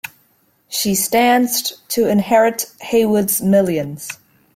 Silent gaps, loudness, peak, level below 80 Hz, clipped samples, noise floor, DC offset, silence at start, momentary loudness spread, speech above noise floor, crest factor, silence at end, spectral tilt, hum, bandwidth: none; -16 LUFS; -2 dBFS; -56 dBFS; under 0.1%; -59 dBFS; under 0.1%; 0.05 s; 14 LU; 43 dB; 14 dB; 0.4 s; -4 dB/octave; none; 16.5 kHz